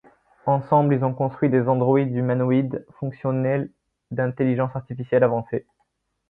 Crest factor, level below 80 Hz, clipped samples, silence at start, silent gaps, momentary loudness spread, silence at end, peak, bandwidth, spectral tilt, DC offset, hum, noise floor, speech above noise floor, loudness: 16 dB; -62 dBFS; under 0.1%; 0.45 s; none; 12 LU; 0.7 s; -6 dBFS; 4 kHz; -12 dB/octave; under 0.1%; none; -72 dBFS; 50 dB; -22 LUFS